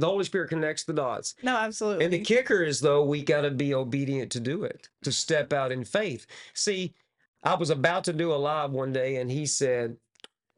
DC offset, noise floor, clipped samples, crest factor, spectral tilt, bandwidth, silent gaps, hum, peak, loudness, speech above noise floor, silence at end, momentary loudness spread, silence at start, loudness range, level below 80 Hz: under 0.1%; -56 dBFS; under 0.1%; 20 dB; -4 dB/octave; 11.5 kHz; 7.28-7.33 s; none; -6 dBFS; -27 LUFS; 29 dB; 0.6 s; 8 LU; 0 s; 3 LU; -70 dBFS